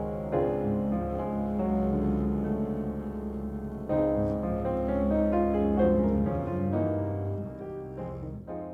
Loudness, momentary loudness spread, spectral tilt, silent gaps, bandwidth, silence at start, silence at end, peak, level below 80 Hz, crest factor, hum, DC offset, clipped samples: -29 LUFS; 12 LU; -10.5 dB/octave; none; 4.1 kHz; 0 s; 0 s; -12 dBFS; -40 dBFS; 16 dB; none; under 0.1%; under 0.1%